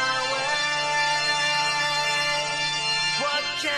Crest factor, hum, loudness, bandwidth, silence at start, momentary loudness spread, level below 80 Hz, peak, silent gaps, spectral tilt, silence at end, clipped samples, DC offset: 14 dB; none; -22 LUFS; 13 kHz; 0 s; 2 LU; -60 dBFS; -10 dBFS; none; -0.5 dB/octave; 0 s; under 0.1%; under 0.1%